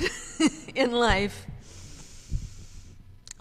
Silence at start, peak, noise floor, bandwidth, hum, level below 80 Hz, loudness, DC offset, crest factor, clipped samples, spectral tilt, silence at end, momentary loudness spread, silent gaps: 0 s; -8 dBFS; -47 dBFS; 15 kHz; none; -40 dBFS; -27 LUFS; under 0.1%; 22 dB; under 0.1%; -4 dB/octave; 0.25 s; 23 LU; none